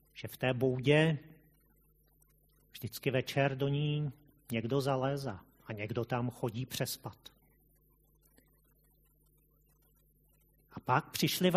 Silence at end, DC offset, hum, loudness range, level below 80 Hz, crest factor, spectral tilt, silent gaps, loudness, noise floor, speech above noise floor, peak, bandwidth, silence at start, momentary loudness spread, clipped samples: 0 s; under 0.1%; none; 9 LU; -68 dBFS; 22 dB; -5.5 dB/octave; none; -34 LUFS; -69 dBFS; 36 dB; -12 dBFS; 15 kHz; 0.15 s; 18 LU; under 0.1%